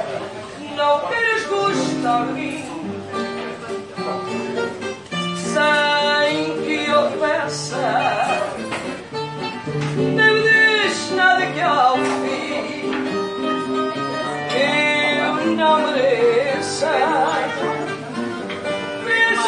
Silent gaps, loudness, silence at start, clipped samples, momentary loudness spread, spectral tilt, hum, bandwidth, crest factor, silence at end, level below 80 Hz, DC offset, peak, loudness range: none; -19 LUFS; 0 s; under 0.1%; 12 LU; -4 dB/octave; none; 11.5 kHz; 18 dB; 0 s; -60 dBFS; under 0.1%; -2 dBFS; 6 LU